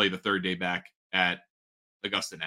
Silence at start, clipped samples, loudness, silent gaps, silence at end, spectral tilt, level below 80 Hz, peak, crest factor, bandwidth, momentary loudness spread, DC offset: 0 s; under 0.1%; -29 LUFS; 0.96-1.10 s, 1.50-2.00 s; 0 s; -3.5 dB/octave; -68 dBFS; -8 dBFS; 22 dB; 16 kHz; 10 LU; under 0.1%